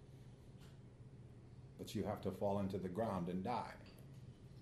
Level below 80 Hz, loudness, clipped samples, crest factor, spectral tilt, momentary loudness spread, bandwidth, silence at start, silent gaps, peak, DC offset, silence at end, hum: -68 dBFS; -43 LUFS; under 0.1%; 18 dB; -7 dB/octave; 18 LU; 13 kHz; 0 s; none; -28 dBFS; under 0.1%; 0 s; none